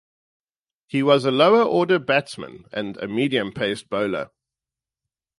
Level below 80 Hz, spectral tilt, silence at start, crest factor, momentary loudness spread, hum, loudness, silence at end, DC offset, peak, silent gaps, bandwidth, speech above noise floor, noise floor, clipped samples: -64 dBFS; -6 dB/octave; 0.95 s; 20 dB; 15 LU; none; -21 LUFS; 1.1 s; under 0.1%; -4 dBFS; none; 11.5 kHz; 69 dB; -89 dBFS; under 0.1%